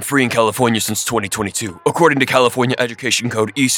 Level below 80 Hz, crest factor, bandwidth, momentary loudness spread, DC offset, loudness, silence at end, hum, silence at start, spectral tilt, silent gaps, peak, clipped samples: -54 dBFS; 16 dB; over 20 kHz; 6 LU; under 0.1%; -16 LUFS; 0 s; none; 0 s; -3.5 dB/octave; none; 0 dBFS; under 0.1%